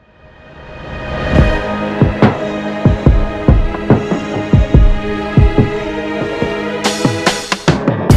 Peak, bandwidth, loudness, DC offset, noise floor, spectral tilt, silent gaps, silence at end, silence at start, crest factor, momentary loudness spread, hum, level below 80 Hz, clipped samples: 0 dBFS; 12.5 kHz; -14 LUFS; under 0.1%; -41 dBFS; -6.5 dB/octave; none; 0 s; 0.45 s; 12 dB; 8 LU; none; -18 dBFS; under 0.1%